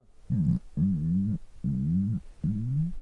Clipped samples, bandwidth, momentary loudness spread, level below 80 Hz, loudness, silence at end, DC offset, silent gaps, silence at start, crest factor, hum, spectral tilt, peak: under 0.1%; 2.1 kHz; 5 LU; -46 dBFS; -29 LUFS; 0 s; under 0.1%; none; 0.3 s; 14 dB; none; -11 dB/octave; -16 dBFS